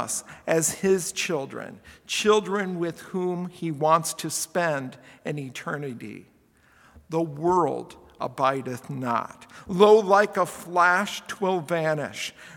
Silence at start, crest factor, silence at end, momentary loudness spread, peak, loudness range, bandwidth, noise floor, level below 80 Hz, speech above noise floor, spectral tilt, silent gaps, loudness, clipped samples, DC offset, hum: 0 s; 24 dB; 0 s; 15 LU; -2 dBFS; 7 LU; 18 kHz; -59 dBFS; -64 dBFS; 34 dB; -4 dB/octave; none; -25 LUFS; under 0.1%; under 0.1%; none